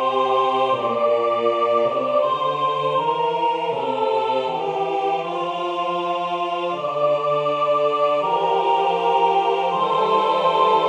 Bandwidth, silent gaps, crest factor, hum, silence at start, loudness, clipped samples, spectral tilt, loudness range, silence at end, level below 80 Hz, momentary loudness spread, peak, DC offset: 9.4 kHz; none; 14 dB; none; 0 s; -20 LUFS; under 0.1%; -5.5 dB/octave; 4 LU; 0 s; -70 dBFS; 5 LU; -6 dBFS; under 0.1%